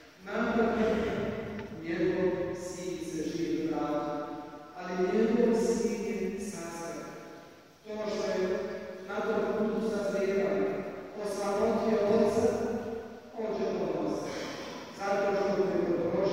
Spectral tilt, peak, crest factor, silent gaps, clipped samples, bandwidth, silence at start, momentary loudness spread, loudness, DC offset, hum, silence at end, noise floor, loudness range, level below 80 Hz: -6 dB/octave; -14 dBFS; 18 dB; none; under 0.1%; 16 kHz; 0 s; 13 LU; -31 LUFS; under 0.1%; none; 0 s; -53 dBFS; 4 LU; -60 dBFS